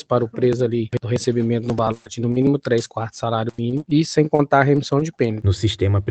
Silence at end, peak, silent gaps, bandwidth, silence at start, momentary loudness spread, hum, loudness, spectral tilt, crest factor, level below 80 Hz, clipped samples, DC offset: 0 s; 0 dBFS; none; 8.8 kHz; 0.1 s; 7 LU; none; -20 LUFS; -7 dB/octave; 20 dB; -50 dBFS; under 0.1%; under 0.1%